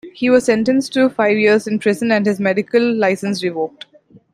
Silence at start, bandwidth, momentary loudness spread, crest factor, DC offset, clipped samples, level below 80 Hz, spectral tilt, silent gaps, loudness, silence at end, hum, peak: 0.05 s; 14.5 kHz; 7 LU; 14 dB; under 0.1%; under 0.1%; -60 dBFS; -5.5 dB/octave; none; -16 LUFS; 0.65 s; none; -2 dBFS